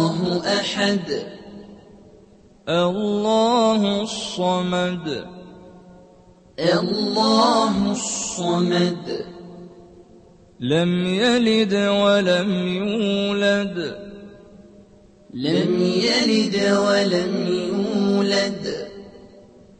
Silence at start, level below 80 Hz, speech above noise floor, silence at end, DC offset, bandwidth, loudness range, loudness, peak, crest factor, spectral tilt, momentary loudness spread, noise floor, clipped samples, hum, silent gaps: 0 s; -56 dBFS; 30 dB; 0.4 s; under 0.1%; 8.8 kHz; 4 LU; -20 LUFS; -4 dBFS; 18 dB; -5 dB/octave; 16 LU; -50 dBFS; under 0.1%; none; none